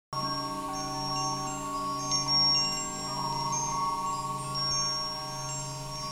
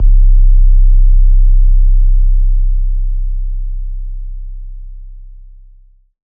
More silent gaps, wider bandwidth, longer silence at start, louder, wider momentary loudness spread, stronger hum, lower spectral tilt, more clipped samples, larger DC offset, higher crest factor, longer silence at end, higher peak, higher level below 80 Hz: neither; first, 17.5 kHz vs 0.3 kHz; about the same, 0.1 s vs 0 s; second, -29 LUFS vs -15 LUFS; second, 11 LU vs 19 LU; neither; second, -2 dB/octave vs -13 dB/octave; neither; neither; first, 16 dB vs 8 dB; second, 0 s vs 1.15 s; second, -16 dBFS vs 0 dBFS; second, -54 dBFS vs -8 dBFS